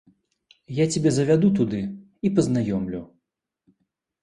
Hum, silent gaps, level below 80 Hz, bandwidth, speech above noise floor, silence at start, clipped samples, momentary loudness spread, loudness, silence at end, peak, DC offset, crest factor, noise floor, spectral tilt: none; none; -54 dBFS; 11 kHz; 57 dB; 0.7 s; under 0.1%; 13 LU; -23 LUFS; 1.2 s; -8 dBFS; under 0.1%; 18 dB; -79 dBFS; -6.5 dB/octave